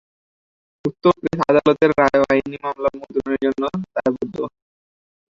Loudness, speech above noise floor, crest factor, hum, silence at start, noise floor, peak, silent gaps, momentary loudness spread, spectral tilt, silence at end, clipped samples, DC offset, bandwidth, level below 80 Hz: -19 LUFS; over 71 dB; 18 dB; none; 0.85 s; under -90 dBFS; -2 dBFS; none; 12 LU; -7 dB/octave; 0.85 s; under 0.1%; under 0.1%; 7.6 kHz; -52 dBFS